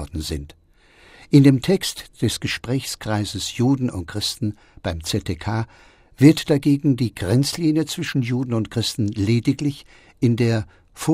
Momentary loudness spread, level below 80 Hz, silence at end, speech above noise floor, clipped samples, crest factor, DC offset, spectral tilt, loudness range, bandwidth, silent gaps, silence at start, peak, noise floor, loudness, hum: 13 LU; -44 dBFS; 0 s; 32 dB; under 0.1%; 20 dB; under 0.1%; -6 dB/octave; 4 LU; 16 kHz; none; 0 s; 0 dBFS; -53 dBFS; -21 LUFS; none